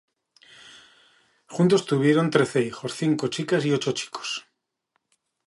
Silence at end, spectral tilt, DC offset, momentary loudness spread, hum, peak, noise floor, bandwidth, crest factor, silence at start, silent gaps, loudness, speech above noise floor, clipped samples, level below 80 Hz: 1.05 s; -5.5 dB/octave; under 0.1%; 11 LU; none; -4 dBFS; -76 dBFS; 11.5 kHz; 22 dB; 0.65 s; none; -24 LUFS; 53 dB; under 0.1%; -70 dBFS